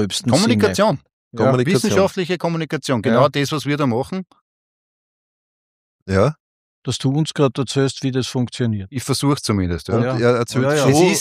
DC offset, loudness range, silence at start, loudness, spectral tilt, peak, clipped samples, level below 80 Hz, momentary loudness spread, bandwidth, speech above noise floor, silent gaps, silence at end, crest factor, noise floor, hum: under 0.1%; 6 LU; 0 s; -18 LUFS; -5.5 dB/octave; -2 dBFS; under 0.1%; -50 dBFS; 7 LU; 15.5 kHz; over 72 dB; 1.13-1.31 s, 4.41-6.06 s, 6.40-6.82 s; 0 s; 18 dB; under -90 dBFS; none